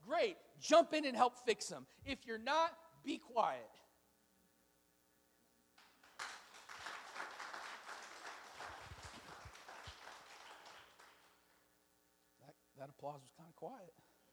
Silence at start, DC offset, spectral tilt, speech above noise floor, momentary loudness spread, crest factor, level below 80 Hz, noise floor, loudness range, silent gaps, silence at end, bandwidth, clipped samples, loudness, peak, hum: 0.05 s; under 0.1%; -3 dB/octave; 37 dB; 21 LU; 26 dB; -74 dBFS; -76 dBFS; 20 LU; none; 0.4 s; over 20 kHz; under 0.1%; -41 LUFS; -18 dBFS; none